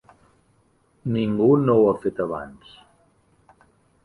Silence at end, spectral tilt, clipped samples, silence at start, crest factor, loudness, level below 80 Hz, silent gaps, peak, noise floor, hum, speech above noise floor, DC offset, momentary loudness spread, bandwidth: 1.5 s; -9.5 dB/octave; under 0.1%; 1.05 s; 18 dB; -21 LUFS; -58 dBFS; none; -6 dBFS; -62 dBFS; none; 42 dB; under 0.1%; 17 LU; 10.5 kHz